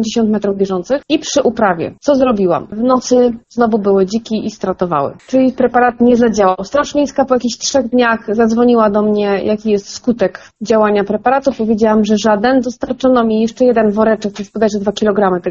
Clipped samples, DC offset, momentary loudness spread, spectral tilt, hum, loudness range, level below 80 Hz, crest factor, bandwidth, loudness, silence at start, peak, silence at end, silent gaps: under 0.1%; under 0.1%; 6 LU; -5 dB/octave; none; 1 LU; -46 dBFS; 12 dB; 7.6 kHz; -13 LUFS; 0 s; 0 dBFS; 0 s; none